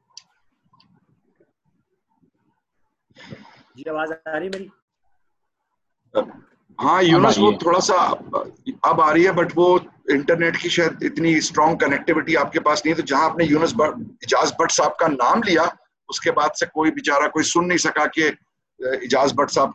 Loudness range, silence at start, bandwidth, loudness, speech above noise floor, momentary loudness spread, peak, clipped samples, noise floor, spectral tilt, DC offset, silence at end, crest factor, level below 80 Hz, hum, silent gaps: 15 LU; 3.2 s; 9 kHz; -19 LUFS; 58 dB; 11 LU; -2 dBFS; under 0.1%; -77 dBFS; -4 dB/octave; under 0.1%; 0 s; 18 dB; -58 dBFS; none; 4.82-4.88 s